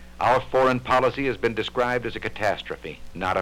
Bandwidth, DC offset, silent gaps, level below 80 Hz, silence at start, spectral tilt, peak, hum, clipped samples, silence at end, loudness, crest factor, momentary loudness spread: 15.5 kHz; under 0.1%; none; -46 dBFS; 0 s; -5.5 dB/octave; -8 dBFS; none; under 0.1%; 0 s; -24 LUFS; 16 dB; 10 LU